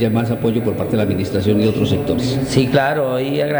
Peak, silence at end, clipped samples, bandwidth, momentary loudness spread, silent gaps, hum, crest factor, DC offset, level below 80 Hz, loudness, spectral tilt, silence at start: -2 dBFS; 0 s; under 0.1%; over 20 kHz; 3 LU; none; none; 16 dB; under 0.1%; -42 dBFS; -17 LUFS; -7 dB/octave; 0 s